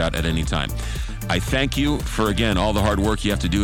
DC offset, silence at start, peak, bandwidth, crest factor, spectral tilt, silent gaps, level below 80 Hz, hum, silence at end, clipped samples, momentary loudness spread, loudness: under 0.1%; 0 s; -6 dBFS; 18.5 kHz; 14 dB; -5 dB/octave; none; -28 dBFS; none; 0 s; under 0.1%; 7 LU; -22 LUFS